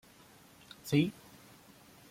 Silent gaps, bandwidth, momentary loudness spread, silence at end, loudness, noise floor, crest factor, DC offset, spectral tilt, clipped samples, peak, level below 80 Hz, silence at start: none; 16.5 kHz; 26 LU; 1 s; -32 LUFS; -59 dBFS; 22 dB; under 0.1%; -6 dB/octave; under 0.1%; -16 dBFS; -70 dBFS; 0.85 s